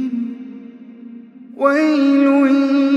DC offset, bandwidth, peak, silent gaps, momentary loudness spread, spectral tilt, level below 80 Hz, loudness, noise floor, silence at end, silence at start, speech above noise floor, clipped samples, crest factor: under 0.1%; 7.6 kHz; -2 dBFS; none; 23 LU; -5.5 dB/octave; -80 dBFS; -15 LUFS; -37 dBFS; 0 s; 0 s; 24 dB; under 0.1%; 16 dB